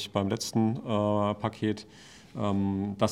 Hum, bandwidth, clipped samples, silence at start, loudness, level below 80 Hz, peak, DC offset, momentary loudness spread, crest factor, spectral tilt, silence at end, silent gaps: none; 14.5 kHz; under 0.1%; 0 s; -29 LUFS; -66 dBFS; -10 dBFS; under 0.1%; 8 LU; 20 dB; -6 dB/octave; 0 s; none